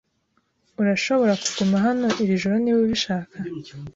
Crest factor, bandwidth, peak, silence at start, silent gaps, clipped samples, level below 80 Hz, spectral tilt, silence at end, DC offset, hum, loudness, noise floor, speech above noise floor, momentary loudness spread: 14 dB; 8 kHz; -8 dBFS; 0.8 s; none; under 0.1%; -58 dBFS; -5 dB/octave; 0.05 s; under 0.1%; none; -21 LUFS; -69 dBFS; 47 dB; 13 LU